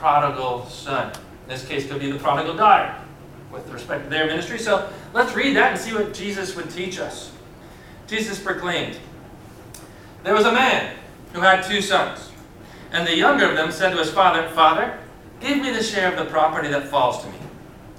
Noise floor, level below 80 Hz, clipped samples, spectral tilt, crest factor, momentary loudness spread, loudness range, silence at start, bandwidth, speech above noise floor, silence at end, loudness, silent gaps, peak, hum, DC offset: -42 dBFS; -50 dBFS; under 0.1%; -4 dB/octave; 20 dB; 21 LU; 8 LU; 0 s; 16.5 kHz; 22 dB; 0 s; -20 LUFS; none; -2 dBFS; none; under 0.1%